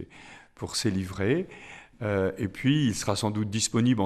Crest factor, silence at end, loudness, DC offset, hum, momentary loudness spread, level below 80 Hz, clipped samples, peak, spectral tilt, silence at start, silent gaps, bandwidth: 16 dB; 0 s; -27 LUFS; under 0.1%; none; 18 LU; -56 dBFS; under 0.1%; -10 dBFS; -5 dB/octave; 0 s; none; 13.5 kHz